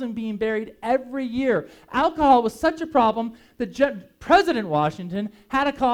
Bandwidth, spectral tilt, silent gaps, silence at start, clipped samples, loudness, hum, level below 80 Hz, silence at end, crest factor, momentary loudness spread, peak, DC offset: 16 kHz; -6 dB/octave; none; 0 s; under 0.1%; -22 LUFS; none; -50 dBFS; 0 s; 18 dB; 12 LU; -4 dBFS; under 0.1%